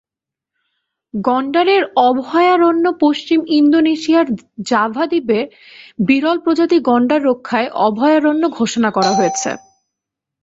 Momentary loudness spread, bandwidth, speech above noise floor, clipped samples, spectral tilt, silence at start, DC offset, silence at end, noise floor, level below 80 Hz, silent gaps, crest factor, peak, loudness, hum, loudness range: 8 LU; 8 kHz; 72 dB; under 0.1%; -4.5 dB/octave; 1.15 s; under 0.1%; 0.85 s; -86 dBFS; -60 dBFS; none; 14 dB; 0 dBFS; -15 LUFS; none; 2 LU